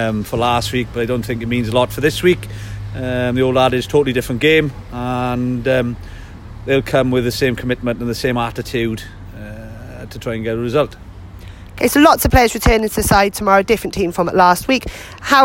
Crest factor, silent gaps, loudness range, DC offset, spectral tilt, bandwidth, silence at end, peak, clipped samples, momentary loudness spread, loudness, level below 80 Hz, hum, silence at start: 16 dB; none; 8 LU; under 0.1%; -5 dB/octave; 16.5 kHz; 0 s; 0 dBFS; under 0.1%; 20 LU; -16 LUFS; -32 dBFS; none; 0 s